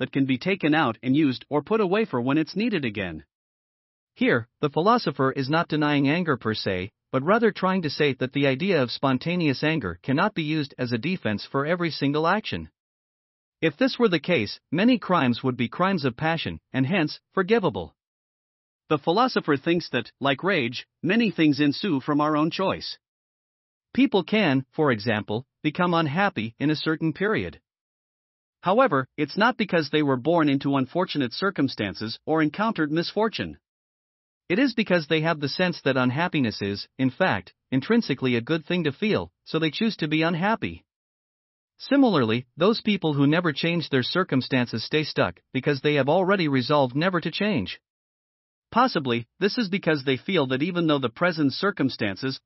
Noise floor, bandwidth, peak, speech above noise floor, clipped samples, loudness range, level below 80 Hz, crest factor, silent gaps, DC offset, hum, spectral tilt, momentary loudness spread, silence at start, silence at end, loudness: under -90 dBFS; 6 kHz; -6 dBFS; over 66 dB; under 0.1%; 3 LU; -62 dBFS; 18 dB; 3.35-4.07 s, 12.80-13.52 s, 18.07-18.79 s, 23.08-23.81 s, 27.81-28.53 s, 33.68-34.41 s, 40.96-41.68 s, 47.90-48.62 s; under 0.1%; none; -4.5 dB/octave; 7 LU; 0 s; 0.1 s; -24 LUFS